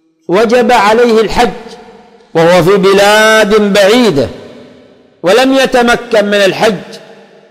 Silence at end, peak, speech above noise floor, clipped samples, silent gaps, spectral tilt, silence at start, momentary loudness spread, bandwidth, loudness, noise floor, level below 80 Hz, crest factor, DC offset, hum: 0.5 s; 0 dBFS; 34 dB; under 0.1%; none; -4.5 dB/octave; 0.3 s; 8 LU; 16 kHz; -8 LUFS; -41 dBFS; -36 dBFS; 8 dB; under 0.1%; none